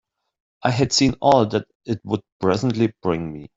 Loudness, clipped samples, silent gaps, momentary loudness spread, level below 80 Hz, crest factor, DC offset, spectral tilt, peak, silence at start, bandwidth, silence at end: -21 LUFS; under 0.1%; 1.75-1.80 s, 2.32-2.40 s; 10 LU; -50 dBFS; 18 dB; under 0.1%; -5 dB/octave; -2 dBFS; 0.65 s; 8 kHz; 0.15 s